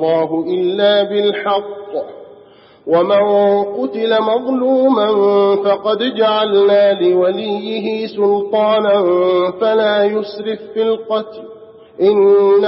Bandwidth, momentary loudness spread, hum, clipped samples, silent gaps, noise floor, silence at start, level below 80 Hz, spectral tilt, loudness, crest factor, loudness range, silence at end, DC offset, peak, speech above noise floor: 5.8 kHz; 9 LU; none; under 0.1%; none; -44 dBFS; 0 s; -66 dBFS; -3.5 dB/octave; -14 LUFS; 12 dB; 3 LU; 0 s; under 0.1%; -2 dBFS; 30 dB